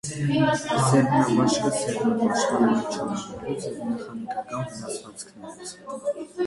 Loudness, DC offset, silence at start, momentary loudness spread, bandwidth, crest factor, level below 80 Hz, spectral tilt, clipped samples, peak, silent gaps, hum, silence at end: -25 LUFS; under 0.1%; 0.05 s; 16 LU; 11.5 kHz; 16 dB; -58 dBFS; -5.5 dB/octave; under 0.1%; -8 dBFS; none; none; 0 s